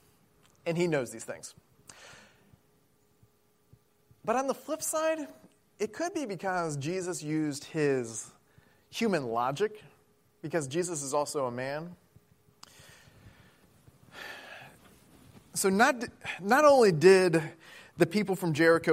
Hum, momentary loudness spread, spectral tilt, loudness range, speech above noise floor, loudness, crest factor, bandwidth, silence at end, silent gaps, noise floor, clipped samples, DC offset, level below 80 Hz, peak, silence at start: none; 22 LU; -4.5 dB/octave; 17 LU; 40 dB; -29 LUFS; 22 dB; 16 kHz; 0 s; none; -68 dBFS; under 0.1%; under 0.1%; -72 dBFS; -8 dBFS; 0.65 s